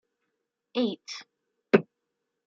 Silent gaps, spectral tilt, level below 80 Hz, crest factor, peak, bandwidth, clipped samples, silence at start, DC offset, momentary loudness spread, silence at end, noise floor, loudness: none; -5.5 dB/octave; -80 dBFS; 26 dB; -4 dBFS; 7.6 kHz; under 0.1%; 0.75 s; under 0.1%; 15 LU; 0.65 s; -83 dBFS; -28 LUFS